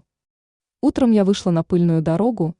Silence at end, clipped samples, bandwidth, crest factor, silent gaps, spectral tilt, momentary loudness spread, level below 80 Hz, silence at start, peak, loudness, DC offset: 0.1 s; under 0.1%; 10.5 kHz; 14 dB; none; -8 dB/octave; 5 LU; -50 dBFS; 0.85 s; -4 dBFS; -18 LUFS; under 0.1%